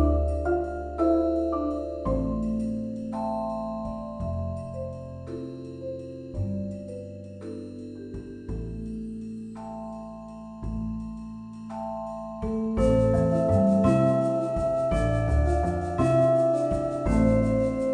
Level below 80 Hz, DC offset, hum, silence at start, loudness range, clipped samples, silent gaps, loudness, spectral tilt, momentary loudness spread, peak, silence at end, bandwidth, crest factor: -36 dBFS; under 0.1%; none; 0 s; 13 LU; under 0.1%; none; -27 LUFS; -9 dB/octave; 17 LU; -10 dBFS; 0 s; 10 kHz; 18 dB